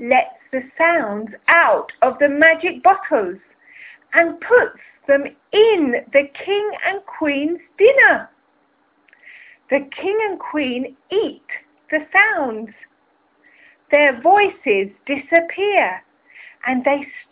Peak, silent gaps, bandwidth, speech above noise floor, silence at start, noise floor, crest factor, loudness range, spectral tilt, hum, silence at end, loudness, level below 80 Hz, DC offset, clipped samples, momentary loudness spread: -2 dBFS; none; 4 kHz; 44 dB; 0 s; -61 dBFS; 16 dB; 5 LU; -6.5 dB/octave; none; 0.1 s; -17 LUFS; -62 dBFS; under 0.1%; under 0.1%; 13 LU